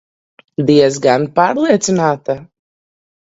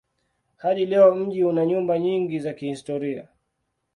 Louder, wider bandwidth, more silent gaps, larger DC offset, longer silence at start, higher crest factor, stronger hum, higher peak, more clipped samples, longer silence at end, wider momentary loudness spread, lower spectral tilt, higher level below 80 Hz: first, -14 LUFS vs -22 LUFS; second, 8 kHz vs 11 kHz; neither; neither; about the same, 0.6 s vs 0.65 s; about the same, 16 dB vs 18 dB; neither; first, 0 dBFS vs -6 dBFS; neither; about the same, 0.8 s vs 0.75 s; about the same, 12 LU vs 13 LU; second, -5 dB/octave vs -7.5 dB/octave; first, -56 dBFS vs -68 dBFS